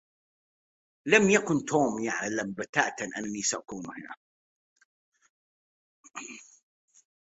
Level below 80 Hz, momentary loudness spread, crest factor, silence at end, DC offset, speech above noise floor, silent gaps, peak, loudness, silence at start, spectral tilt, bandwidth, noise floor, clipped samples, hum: -70 dBFS; 21 LU; 26 dB; 0.95 s; under 0.1%; over 62 dB; 2.69-2.73 s, 4.17-4.76 s, 4.85-5.12 s, 5.29-6.04 s; -4 dBFS; -27 LUFS; 1.05 s; -3.5 dB/octave; 8.2 kHz; under -90 dBFS; under 0.1%; none